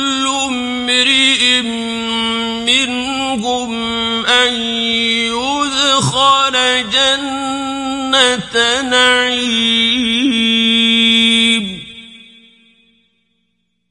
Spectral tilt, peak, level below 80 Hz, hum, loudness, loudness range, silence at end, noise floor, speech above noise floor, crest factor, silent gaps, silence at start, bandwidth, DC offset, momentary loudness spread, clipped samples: -2 dB/octave; 0 dBFS; -48 dBFS; none; -12 LUFS; 3 LU; 1.75 s; -67 dBFS; 53 dB; 14 dB; none; 0 s; 11.5 kHz; under 0.1%; 9 LU; under 0.1%